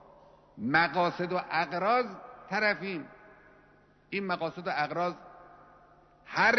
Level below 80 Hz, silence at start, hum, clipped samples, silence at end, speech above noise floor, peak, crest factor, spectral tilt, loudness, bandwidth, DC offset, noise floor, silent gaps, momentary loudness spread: -68 dBFS; 0.55 s; 50 Hz at -70 dBFS; under 0.1%; 0 s; 32 dB; -10 dBFS; 20 dB; -5.5 dB/octave; -30 LUFS; 6.4 kHz; under 0.1%; -62 dBFS; none; 13 LU